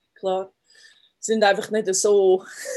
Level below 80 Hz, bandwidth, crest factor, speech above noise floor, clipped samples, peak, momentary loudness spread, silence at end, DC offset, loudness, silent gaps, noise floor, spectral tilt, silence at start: -76 dBFS; 12.5 kHz; 18 dB; 33 dB; under 0.1%; -4 dBFS; 12 LU; 0 s; under 0.1%; -21 LUFS; none; -54 dBFS; -3 dB/octave; 0.25 s